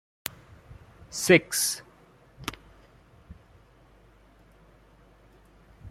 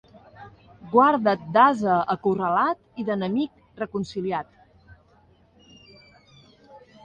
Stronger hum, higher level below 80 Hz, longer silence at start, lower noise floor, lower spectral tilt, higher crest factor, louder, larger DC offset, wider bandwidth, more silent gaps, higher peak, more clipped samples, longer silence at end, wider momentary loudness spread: neither; about the same, -58 dBFS vs -62 dBFS; first, 0.7 s vs 0.4 s; about the same, -57 dBFS vs -58 dBFS; second, -3 dB/octave vs -7 dB/octave; first, 28 dB vs 20 dB; second, -26 LUFS vs -23 LUFS; neither; first, 16 kHz vs 9.2 kHz; neither; about the same, -4 dBFS vs -4 dBFS; neither; second, 0 s vs 0.25 s; first, 19 LU vs 13 LU